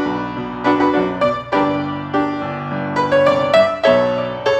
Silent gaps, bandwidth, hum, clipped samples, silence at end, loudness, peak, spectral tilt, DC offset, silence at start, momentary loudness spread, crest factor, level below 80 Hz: none; 8.8 kHz; none; under 0.1%; 0 s; -17 LUFS; 0 dBFS; -6.5 dB/octave; under 0.1%; 0 s; 10 LU; 16 dB; -48 dBFS